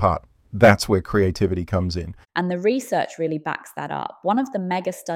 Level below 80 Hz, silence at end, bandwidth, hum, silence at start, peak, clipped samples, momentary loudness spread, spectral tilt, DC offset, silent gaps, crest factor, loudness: -44 dBFS; 0 s; 16 kHz; none; 0 s; -2 dBFS; under 0.1%; 13 LU; -6 dB/octave; under 0.1%; none; 20 dB; -22 LUFS